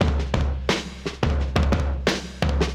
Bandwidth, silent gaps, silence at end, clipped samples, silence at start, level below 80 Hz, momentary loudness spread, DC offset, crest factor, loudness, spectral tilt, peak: 11.5 kHz; none; 0 s; under 0.1%; 0 s; -26 dBFS; 4 LU; under 0.1%; 20 dB; -24 LUFS; -5.5 dB/octave; -2 dBFS